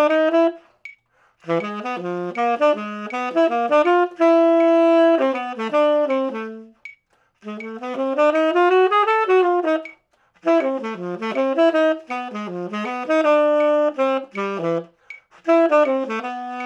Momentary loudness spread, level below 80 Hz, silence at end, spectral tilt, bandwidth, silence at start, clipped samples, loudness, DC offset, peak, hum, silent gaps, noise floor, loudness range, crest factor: 14 LU; -78 dBFS; 0 s; -6 dB/octave; 8.4 kHz; 0 s; under 0.1%; -19 LUFS; under 0.1%; -4 dBFS; none; none; -60 dBFS; 5 LU; 14 dB